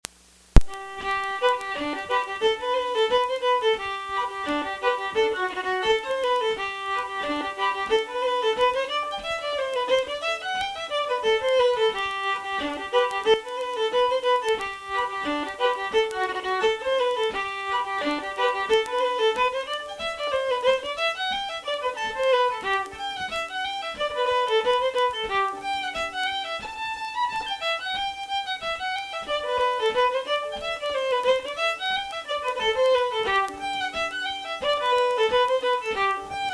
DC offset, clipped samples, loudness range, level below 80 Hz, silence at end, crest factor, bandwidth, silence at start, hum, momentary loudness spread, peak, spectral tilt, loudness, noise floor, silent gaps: under 0.1%; under 0.1%; 2 LU; -38 dBFS; 0 s; 24 dB; 11 kHz; 0.55 s; none; 7 LU; 0 dBFS; -3.5 dB/octave; -25 LUFS; -54 dBFS; none